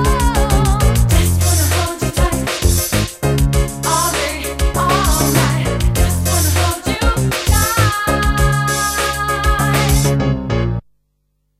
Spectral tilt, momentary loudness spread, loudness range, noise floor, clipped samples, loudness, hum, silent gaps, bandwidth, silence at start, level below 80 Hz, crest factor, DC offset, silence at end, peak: -4.5 dB/octave; 4 LU; 1 LU; -65 dBFS; under 0.1%; -15 LUFS; none; none; 16 kHz; 0 s; -20 dBFS; 14 dB; under 0.1%; 0.8 s; 0 dBFS